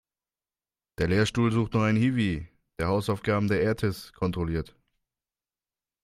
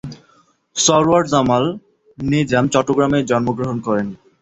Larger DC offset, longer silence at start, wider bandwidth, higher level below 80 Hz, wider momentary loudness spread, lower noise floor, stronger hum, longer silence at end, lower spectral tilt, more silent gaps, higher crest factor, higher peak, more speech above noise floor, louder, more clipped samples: neither; first, 1 s vs 0.05 s; first, 14.5 kHz vs 8.4 kHz; about the same, -50 dBFS vs -48 dBFS; second, 9 LU vs 13 LU; first, under -90 dBFS vs -56 dBFS; neither; first, 1.4 s vs 0.25 s; first, -7 dB/octave vs -4.5 dB/octave; neither; about the same, 18 dB vs 16 dB; second, -10 dBFS vs -2 dBFS; first, over 64 dB vs 40 dB; second, -27 LUFS vs -17 LUFS; neither